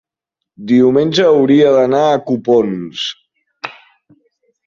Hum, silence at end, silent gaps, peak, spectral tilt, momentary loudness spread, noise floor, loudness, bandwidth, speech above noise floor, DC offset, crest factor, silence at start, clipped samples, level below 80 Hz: none; 0.95 s; none; -2 dBFS; -6 dB/octave; 19 LU; -80 dBFS; -12 LUFS; 7.4 kHz; 68 dB; under 0.1%; 14 dB; 0.6 s; under 0.1%; -58 dBFS